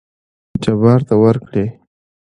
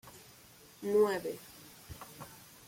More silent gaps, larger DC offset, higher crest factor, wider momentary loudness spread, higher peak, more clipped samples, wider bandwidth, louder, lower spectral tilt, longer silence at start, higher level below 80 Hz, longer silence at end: neither; neither; about the same, 16 dB vs 18 dB; second, 12 LU vs 26 LU; first, 0 dBFS vs -18 dBFS; neither; second, 10 kHz vs 16.5 kHz; first, -15 LUFS vs -32 LUFS; first, -9 dB/octave vs -5 dB/octave; first, 0.55 s vs 0.05 s; first, -46 dBFS vs -66 dBFS; first, 0.65 s vs 0.3 s